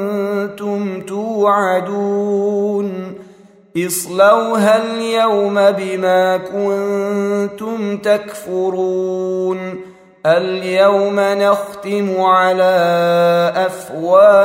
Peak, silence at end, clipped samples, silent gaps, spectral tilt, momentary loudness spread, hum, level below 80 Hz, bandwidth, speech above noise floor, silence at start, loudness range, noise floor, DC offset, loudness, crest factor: 0 dBFS; 0 s; under 0.1%; none; -5 dB/octave; 10 LU; none; -64 dBFS; 16 kHz; 29 dB; 0 s; 5 LU; -44 dBFS; under 0.1%; -15 LUFS; 14 dB